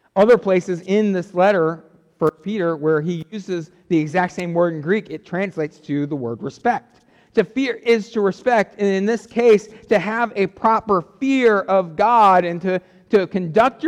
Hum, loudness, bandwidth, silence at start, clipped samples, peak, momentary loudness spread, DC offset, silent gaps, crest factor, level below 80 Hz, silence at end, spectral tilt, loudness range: none; -19 LUFS; 10 kHz; 0.15 s; under 0.1%; -6 dBFS; 10 LU; under 0.1%; none; 14 dB; -60 dBFS; 0 s; -6.5 dB/octave; 5 LU